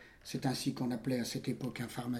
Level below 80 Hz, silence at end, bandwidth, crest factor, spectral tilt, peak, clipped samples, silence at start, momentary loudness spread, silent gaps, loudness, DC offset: -66 dBFS; 0 s; 16.5 kHz; 18 dB; -5 dB/octave; -20 dBFS; under 0.1%; 0 s; 5 LU; none; -37 LUFS; under 0.1%